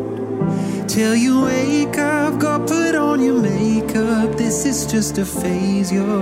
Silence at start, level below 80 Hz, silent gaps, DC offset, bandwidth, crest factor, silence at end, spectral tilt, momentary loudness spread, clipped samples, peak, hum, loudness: 0 s; -44 dBFS; none; under 0.1%; 16 kHz; 12 dB; 0 s; -5 dB/octave; 5 LU; under 0.1%; -6 dBFS; none; -18 LUFS